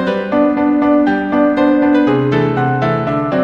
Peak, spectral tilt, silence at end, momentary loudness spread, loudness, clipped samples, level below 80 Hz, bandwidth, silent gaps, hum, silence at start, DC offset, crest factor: 0 dBFS; -9 dB/octave; 0 s; 4 LU; -13 LUFS; under 0.1%; -46 dBFS; 5.8 kHz; none; none; 0 s; under 0.1%; 12 dB